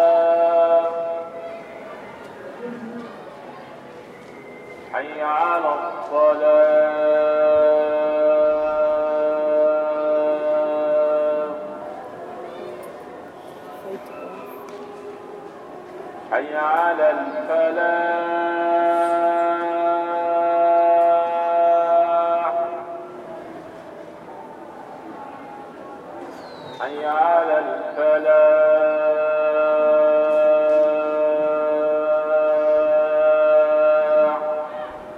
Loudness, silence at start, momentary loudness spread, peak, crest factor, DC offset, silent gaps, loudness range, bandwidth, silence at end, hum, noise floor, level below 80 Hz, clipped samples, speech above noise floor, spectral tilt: -19 LUFS; 0 s; 21 LU; -6 dBFS; 14 dB; under 0.1%; none; 18 LU; 5.2 kHz; 0 s; none; -40 dBFS; -68 dBFS; under 0.1%; 22 dB; -6 dB/octave